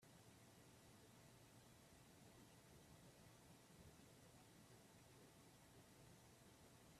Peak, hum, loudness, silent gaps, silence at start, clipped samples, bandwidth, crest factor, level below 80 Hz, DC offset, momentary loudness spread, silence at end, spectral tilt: -54 dBFS; none; -68 LUFS; none; 0 s; under 0.1%; 14.5 kHz; 14 dB; -82 dBFS; under 0.1%; 1 LU; 0 s; -4 dB/octave